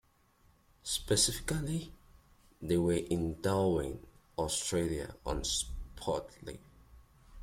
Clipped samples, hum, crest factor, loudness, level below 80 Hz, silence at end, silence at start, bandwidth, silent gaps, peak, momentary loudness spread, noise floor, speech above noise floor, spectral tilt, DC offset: under 0.1%; none; 20 dB; -34 LUFS; -50 dBFS; 0 s; 0.85 s; 16.5 kHz; none; -16 dBFS; 18 LU; -67 dBFS; 34 dB; -4 dB/octave; under 0.1%